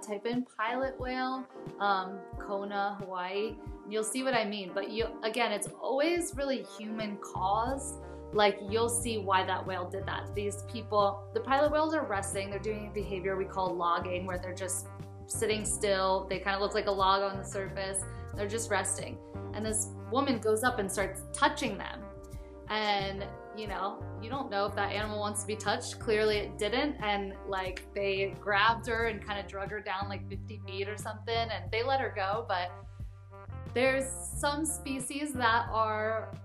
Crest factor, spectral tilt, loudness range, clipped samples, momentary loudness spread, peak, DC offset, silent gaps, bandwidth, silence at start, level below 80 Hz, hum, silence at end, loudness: 22 dB; -3.5 dB/octave; 3 LU; under 0.1%; 11 LU; -10 dBFS; under 0.1%; none; 14 kHz; 0 s; -50 dBFS; none; 0 s; -32 LUFS